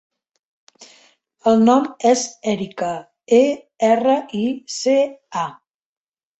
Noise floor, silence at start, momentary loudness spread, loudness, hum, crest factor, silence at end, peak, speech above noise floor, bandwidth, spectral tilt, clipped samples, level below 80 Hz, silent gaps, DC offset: -55 dBFS; 0.8 s; 11 LU; -19 LUFS; none; 18 dB; 0.85 s; -2 dBFS; 37 dB; 8.2 kHz; -4.5 dB/octave; under 0.1%; -64 dBFS; none; under 0.1%